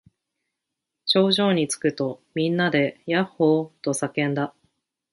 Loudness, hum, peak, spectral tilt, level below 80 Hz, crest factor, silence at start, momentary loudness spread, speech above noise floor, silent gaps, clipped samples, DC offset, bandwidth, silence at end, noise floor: -23 LUFS; none; -6 dBFS; -4.5 dB/octave; -68 dBFS; 18 dB; 1.05 s; 9 LU; 61 dB; none; under 0.1%; under 0.1%; 11.5 kHz; 0.65 s; -83 dBFS